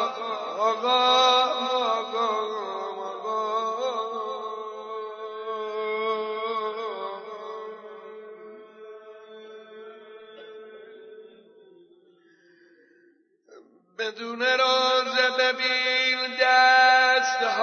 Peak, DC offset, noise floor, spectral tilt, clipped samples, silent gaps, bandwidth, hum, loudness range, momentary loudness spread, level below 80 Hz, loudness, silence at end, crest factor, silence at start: -8 dBFS; under 0.1%; -62 dBFS; -0.5 dB/octave; under 0.1%; none; 6.6 kHz; none; 24 LU; 26 LU; under -90 dBFS; -23 LUFS; 0 s; 18 dB; 0 s